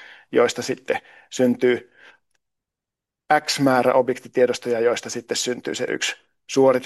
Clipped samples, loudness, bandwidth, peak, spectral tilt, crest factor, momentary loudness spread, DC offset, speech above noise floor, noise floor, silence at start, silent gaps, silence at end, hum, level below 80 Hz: under 0.1%; -21 LUFS; 12.5 kHz; -4 dBFS; -4 dB/octave; 18 dB; 9 LU; under 0.1%; 66 dB; -87 dBFS; 0 s; none; 0 s; none; -70 dBFS